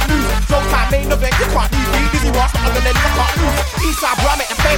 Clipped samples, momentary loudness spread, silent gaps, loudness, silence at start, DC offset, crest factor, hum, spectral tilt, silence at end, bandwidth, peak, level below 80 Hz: under 0.1%; 2 LU; none; -15 LUFS; 0 s; under 0.1%; 14 dB; none; -4 dB/octave; 0 s; 17.5 kHz; 0 dBFS; -18 dBFS